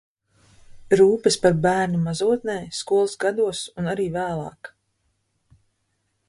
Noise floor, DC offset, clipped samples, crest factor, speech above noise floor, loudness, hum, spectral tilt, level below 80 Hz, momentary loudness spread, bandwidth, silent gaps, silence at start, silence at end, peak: -72 dBFS; under 0.1%; under 0.1%; 20 dB; 51 dB; -22 LUFS; none; -5 dB/octave; -56 dBFS; 11 LU; 11.5 kHz; none; 0.7 s; 1.6 s; -4 dBFS